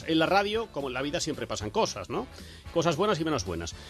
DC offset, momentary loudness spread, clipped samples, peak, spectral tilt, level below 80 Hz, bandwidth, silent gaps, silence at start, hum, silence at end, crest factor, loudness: under 0.1%; 11 LU; under 0.1%; -10 dBFS; -4.5 dB/octave; -52 dBFS; 13 kHz; none; 0 s; none; 0 s; 18 dB; -29 LUFS